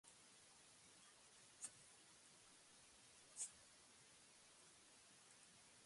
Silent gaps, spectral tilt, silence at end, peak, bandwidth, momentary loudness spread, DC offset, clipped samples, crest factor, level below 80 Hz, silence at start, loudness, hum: none; 0 dB/octave; 0 s; -36 dBFS; 11.5 kHz; 14 LU; under 0.1%; under 0.1%; 28 dB; under -90 dBFS; 0.05 s; -61 LUFS; none